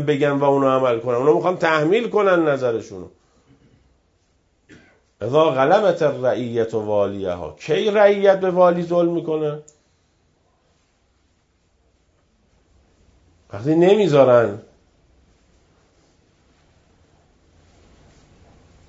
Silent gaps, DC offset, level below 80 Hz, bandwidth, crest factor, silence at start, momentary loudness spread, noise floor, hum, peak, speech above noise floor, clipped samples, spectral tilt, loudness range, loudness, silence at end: none; under 0.1%; -60 dBFS; 7.8 kHz; 20 dB; 0 s; 13 LU; -63 dBFS; none; -2 dBFS; 46 dB; under 0.1%; -7 dB/octave; 7 LU; -18 LUFS; 4.3 s